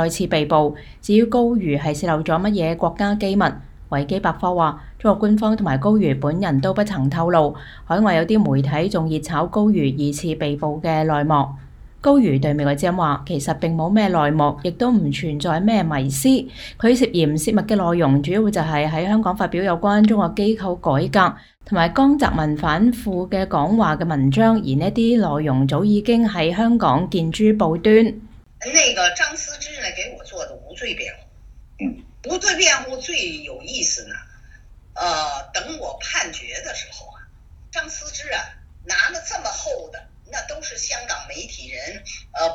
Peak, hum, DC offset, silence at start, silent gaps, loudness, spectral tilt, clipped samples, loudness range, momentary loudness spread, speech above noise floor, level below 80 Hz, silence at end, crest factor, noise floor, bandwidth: 0 dBFS; none; under 0.1%; 0 s; none; -19 LUFS; -5 dB/octave; under 0.1%; 8 LU; 14 LU; 26 dB; -42 dBFS; 0 s; 20 dB; -45 dBFS; 16 kHz